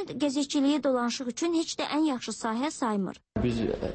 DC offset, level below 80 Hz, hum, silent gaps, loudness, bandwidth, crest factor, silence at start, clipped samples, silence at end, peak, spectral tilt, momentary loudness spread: under 0.1%; -50 dBFS; none; none; -29 LUFS; 8.8 kHz; 12 dB; 0 s; under 0.1%; 0 s; -16 dBFS; -4.5 dB/octave; 6 LU